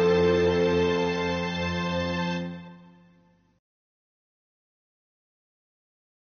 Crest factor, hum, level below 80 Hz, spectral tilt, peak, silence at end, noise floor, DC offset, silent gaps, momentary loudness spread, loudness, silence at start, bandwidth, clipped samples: 16 dB; none; -54 dBFS; -4.5 dB/octave; -12 dBFS; 3.45 s; -61 dBFS; under 0.1%; none; 10 LU; -25 LUFS; 0 s; 6.6 kHz; under 0.1%